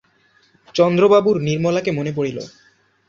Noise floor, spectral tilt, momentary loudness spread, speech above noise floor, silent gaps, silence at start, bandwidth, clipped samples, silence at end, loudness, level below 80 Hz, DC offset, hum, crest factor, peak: -58 dBFS; -6.5 dB/octave; 13 LU; 41 dB; none; 0.75 s; 7.4 kHz; under 0.1%; 0.6 s; -17 LUFS; -58 dBFS; under 0.1%; none; 16 dB; -2 dBFS